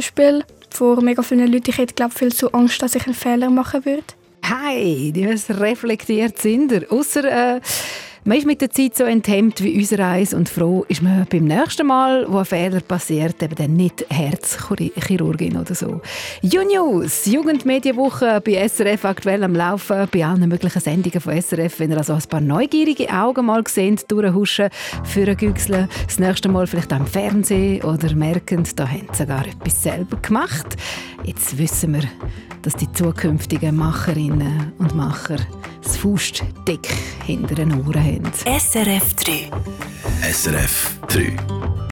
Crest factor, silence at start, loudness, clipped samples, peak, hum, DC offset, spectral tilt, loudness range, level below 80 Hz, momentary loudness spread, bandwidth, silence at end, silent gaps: 16 dB; 0 s; -18 LUFS; under 0.1%; -2 dBFS; none; under 0.1%; -5 dB/octave; 4 LU; -38 dBFS; 8 LU; 19 kHz; 0 s; none